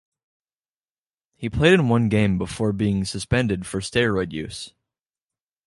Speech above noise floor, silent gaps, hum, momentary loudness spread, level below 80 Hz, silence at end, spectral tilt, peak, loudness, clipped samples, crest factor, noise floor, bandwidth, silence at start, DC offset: over 69 dB; none; none; 15 LU; -42 dBFS; 1 s; -6 dB/octave; -4 dBFS; -22 LUFS; under 0.1%; 20 dB; under -90 dBFS; 11.5 kHz; 1.4 s; under 0.1%